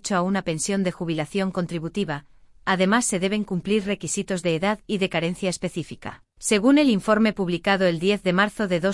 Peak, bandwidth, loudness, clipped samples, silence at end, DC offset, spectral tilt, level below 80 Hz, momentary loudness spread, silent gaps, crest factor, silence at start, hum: -6 dBFS; 12 kHz; -23 LUFS; under 0.1%; 0 s; under 0.1%; -4.5 dB/octave; -52 dBFS; 10 LU; none; 18 dB; 0.05 s; none